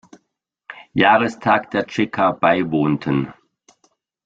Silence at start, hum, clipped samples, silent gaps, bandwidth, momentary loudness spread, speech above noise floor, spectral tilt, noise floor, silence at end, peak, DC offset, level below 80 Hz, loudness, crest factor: 0.7 s; none; under 0.1%; none; 7.8 kHz; 13 LU; 57 dB; -6.5 dB/octave; -75 dBFS; 0.95 s; -2 dBFS; under 0.1%; -56 dBFS; -18 LUFS; 18 dB